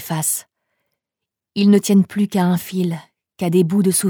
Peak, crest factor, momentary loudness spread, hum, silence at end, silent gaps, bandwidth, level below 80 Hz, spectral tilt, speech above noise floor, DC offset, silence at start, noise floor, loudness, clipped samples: -4 dBFS; 16 dB; 11 LU; none; 0 s; none; over 20 kHz; -66 dBFS; -5.5 dB/octave; 68 dB; under 0.1%; 0 s; -84 dBFS; -17 LUFS; under 0.1%